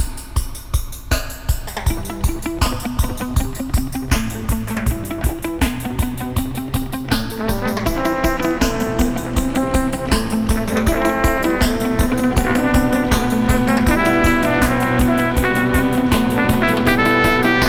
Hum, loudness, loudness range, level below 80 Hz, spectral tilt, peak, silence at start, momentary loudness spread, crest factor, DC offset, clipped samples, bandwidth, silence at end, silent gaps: none; -18 LUFS; 6 LU; -24 dBFS; -5.5 dB/octave; -2 dBFS; 0 s; 8 LU; 16 dB; under 0.1%; under 0.1%; over 20 kHz; 0 s; none